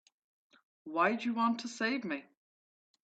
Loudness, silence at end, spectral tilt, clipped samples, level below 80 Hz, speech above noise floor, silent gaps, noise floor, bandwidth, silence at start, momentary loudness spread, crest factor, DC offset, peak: -33 LUFS; 0.8 s; -4.5 dB/octave; under 0.1%; -84 dBFS; over 57 dB; none; under -90 dBFS; 8.6 kHz; 0.85 s; 10 LU; 20 dB; under 0.1%; -16 dBFS